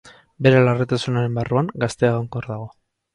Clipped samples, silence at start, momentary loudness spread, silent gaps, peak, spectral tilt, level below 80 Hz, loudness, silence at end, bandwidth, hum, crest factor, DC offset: under 0.1%; 0.05 s; 15 LU; none; -2 dBFS; -7 dB/octave; -52 dBFS; -20 LUFS; 0.45 s; 11 kHz; none; 18 dB; under 0.1%